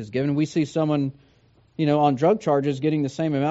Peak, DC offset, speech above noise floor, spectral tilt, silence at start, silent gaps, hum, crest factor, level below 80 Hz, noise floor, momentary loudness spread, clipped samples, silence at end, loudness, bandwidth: -6 dBFS; under 0.1%; 36 dB; -7 dB/octave; 0 s; none; none; 16 dB; -62 dBFS; -58 dBFS; 6 LU; under 0.1%; 0 s; -23 LUFS; 8 kHz